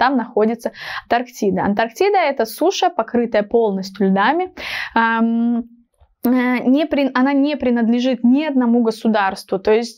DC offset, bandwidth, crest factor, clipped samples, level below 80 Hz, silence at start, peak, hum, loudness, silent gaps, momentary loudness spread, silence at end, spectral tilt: under 0.1%; 16 kHz; 16 dB; under 0.1%; -54 dBFS; 0 s; -2 dBFS; none; -17 LUFS; none; 6 LU; 0.05 s; -5.5 dB/octave